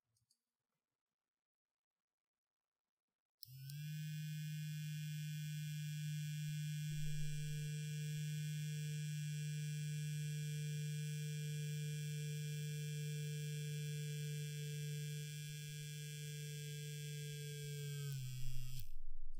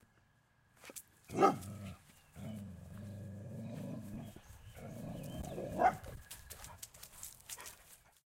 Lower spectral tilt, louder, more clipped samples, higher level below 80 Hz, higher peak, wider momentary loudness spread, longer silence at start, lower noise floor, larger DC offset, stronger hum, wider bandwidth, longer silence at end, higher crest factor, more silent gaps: about the same, -5 dB/octave vs -5.5 dB/octave; second, -46 LUFS vs -41 LUFS; neither; first, -56 dBFS vs -62 dBFS; second, -30 dBFS vs -14 dBFS; second, 5 LU vs 20 LU; first, 3.45 s vs 0.8 s; first, -84 dBFS vs -72 dBFS; neither; neither; about the same, 16 kHz vs 16.5 kHz; second, 0 s vs 0.3 s; second, 16 dB vs 28 dB; neither